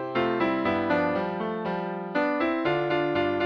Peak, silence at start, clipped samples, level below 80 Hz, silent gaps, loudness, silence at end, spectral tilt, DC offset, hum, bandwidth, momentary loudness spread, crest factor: -12 dBFS; 0 s; under 0.1%; -60 dBFS; none; -26 LUFS; 0 s; -7.5 dB/octave; under 0.1%; none; 6.2 kHz; 5 LU; 14 dB